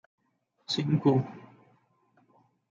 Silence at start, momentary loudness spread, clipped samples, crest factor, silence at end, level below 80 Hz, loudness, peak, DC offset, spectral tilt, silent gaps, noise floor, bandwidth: 0.7 s; 25 LU; under 0.1%; 22 dB; 1.3 s; -74 dBFS; -28 LUFS; -10 dBFS; under 0.1%; -7 dB/octave; none; -74 dBFS; 7.6 kHz